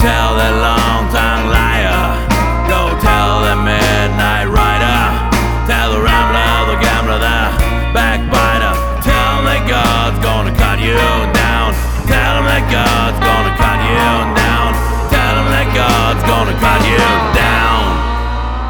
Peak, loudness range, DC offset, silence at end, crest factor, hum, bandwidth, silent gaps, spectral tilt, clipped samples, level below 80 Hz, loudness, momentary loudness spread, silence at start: 0 dBFS; 1 LU; under 0.1%; 0 s; 12 dB; none; over 20 kHz; none; -5 dB/octave; under 0.1%; -16 dBFS; -12 LUFS; 3 LU; 0 s